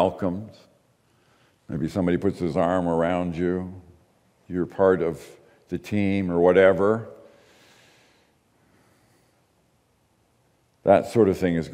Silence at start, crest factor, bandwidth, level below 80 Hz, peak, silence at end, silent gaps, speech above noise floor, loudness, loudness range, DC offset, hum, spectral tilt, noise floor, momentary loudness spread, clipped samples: 0 s; 22 dB; 15 kHz; -58 dBFS; -4 dBFS; 0 s; none; 43 dB; -23 LUFS; 4 LU; under 0.1%; none; -7.5 dB/octave; -65 dBFS; 17 LU; under 0.1%